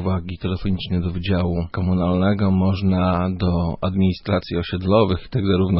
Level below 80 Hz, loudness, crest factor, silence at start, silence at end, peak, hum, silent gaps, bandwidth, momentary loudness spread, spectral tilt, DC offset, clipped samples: -38 dBFS; -21 LUFS; 16 dB; 0 s; 0 s; -4 dBFS; none; none; 5.8 kHz; 6 LU; -12.5 dB/octave; under 0.1%; under 0.1%